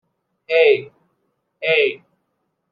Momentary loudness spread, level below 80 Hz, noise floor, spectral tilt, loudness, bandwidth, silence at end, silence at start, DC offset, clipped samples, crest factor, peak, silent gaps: 10 LU; -80 dBFS; -72 dBFS; -5.5 dB/octave; -17 LUFS; 5 kHz; 0.75 s; 0.5 s; under 0.1%; under 0.1%; 18 dB; -2 dBFS; none